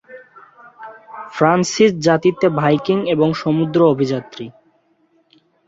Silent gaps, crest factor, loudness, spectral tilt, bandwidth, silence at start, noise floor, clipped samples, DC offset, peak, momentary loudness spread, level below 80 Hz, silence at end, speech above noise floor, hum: none; 16 dB; -16 LUFS; -6 dB/octave; 8 kHz; 0.1 s; -59 dBFS; under 0.1%; under 0.1%; -2 dBFS; 20 LU; -58 dBFS; 1.2 s; 44 dB; none